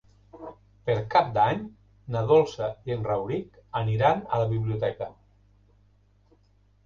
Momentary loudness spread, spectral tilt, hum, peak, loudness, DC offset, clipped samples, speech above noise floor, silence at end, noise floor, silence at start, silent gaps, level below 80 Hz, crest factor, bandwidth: 18 LU; -7.5 dB/octave; 50 Hz at -50 dBFS; -8 dBFS; -26 LUFS; under 0.1%; under 0.1%; 37 dB; 1.75 s; -62 dBFS; 0.35 s; none; -54 dBFS; 20 dB; 7.2 kHz